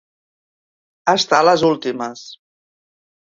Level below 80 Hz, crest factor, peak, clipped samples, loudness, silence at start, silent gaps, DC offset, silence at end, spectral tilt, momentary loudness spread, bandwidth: -62 dBFS; 20 dB; 0 dBFS; under 0.1%; -16 LUFS; 1.05 s; none; under 0.1%; 1 s; -3.5 dB/octave; 15 LU; 7.8 kHz